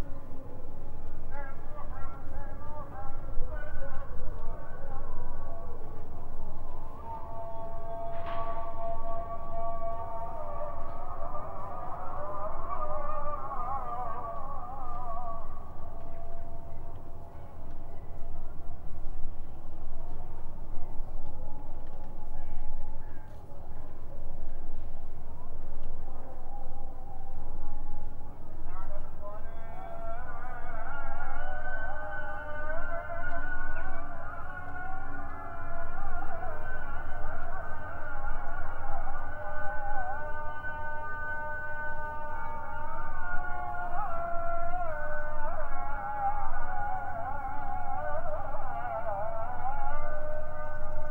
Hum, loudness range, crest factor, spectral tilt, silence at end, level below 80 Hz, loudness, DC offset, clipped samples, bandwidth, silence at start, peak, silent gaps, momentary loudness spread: none; 9 LU; 14 dB; -8 dB/octave; 0 s; -32 dBFS; -39 LUFS; under 0.1%; under 0.1%; 2.3 kHz; 0 s; -12 dBFS; none; 10 LU